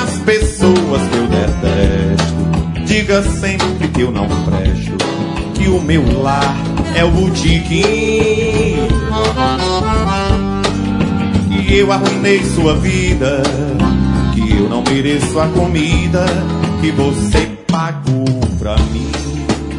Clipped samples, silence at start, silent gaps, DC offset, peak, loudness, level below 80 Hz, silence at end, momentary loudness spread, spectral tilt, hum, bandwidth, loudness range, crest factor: under 0.1%; 0 s; none; under 0.1%; 0 dBFS; -14 LUFS; -22 dBFS; 0 s; 4 LU; -6 dB/octave; none; 11 kHz; 2 LU; 14 dB